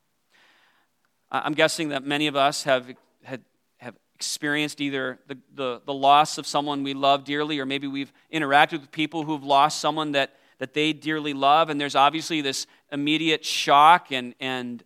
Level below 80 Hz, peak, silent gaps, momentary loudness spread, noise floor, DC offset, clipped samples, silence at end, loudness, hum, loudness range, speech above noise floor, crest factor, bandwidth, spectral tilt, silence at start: -80 dBFS; -2 dBFS; none; 13 LU; -71 dBFS; under 0.1%; under 0.1%; 0.1 s; -23 LUFS; none; 5 LU; 47 dB; 22 dB; 15.5 kHz; -3.5 dB/octave; 1.3 s